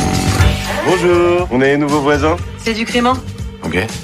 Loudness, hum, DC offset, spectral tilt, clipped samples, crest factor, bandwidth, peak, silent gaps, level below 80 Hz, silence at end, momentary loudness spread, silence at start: -14 LUFS; none; under 0.1%; -5.5 dB/octave; under 0.1%; 14 dB; 15.5 kHz; 0 dBFS; none; -26 dBFS; 0 s; 8 LU; 0 s